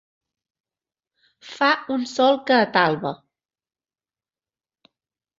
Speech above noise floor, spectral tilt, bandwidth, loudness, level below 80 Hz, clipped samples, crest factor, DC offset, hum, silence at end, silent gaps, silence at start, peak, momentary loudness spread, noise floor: over 70 dB; -4.5 dB/octave; 7.8 kHz; -20 LUFS; -72 dBFS; under 0.1%; 22 dB; under 0.1%; none; 2.25 s; none; 1.45 s; -2 dBFS; 15 LU; under -90 dBFS